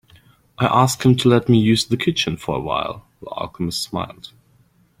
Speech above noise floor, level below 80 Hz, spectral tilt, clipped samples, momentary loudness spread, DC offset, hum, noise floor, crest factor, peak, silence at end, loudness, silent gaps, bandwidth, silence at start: 38 dB; -50 dBFS; -5.5 dB/octave; under 0.1%; 15 LU; under 0.1%; none; -57 dBFS; 18 dB; -2 dBFS; 0.75 s; -19 LUFS; none; 16 kHz; 0.6 s